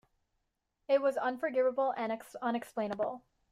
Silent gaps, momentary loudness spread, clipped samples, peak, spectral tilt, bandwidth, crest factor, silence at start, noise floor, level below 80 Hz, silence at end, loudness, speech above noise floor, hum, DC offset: none; 8 LU; under 0.1%; -18 dBFS; -5.5 dB/octave; 14.5 kHz; 16 dB; 0.9 s; -82 dBFS; -78 dBFS; 0.3 s; -33 LUFS; 50 dB; none; under 0.1%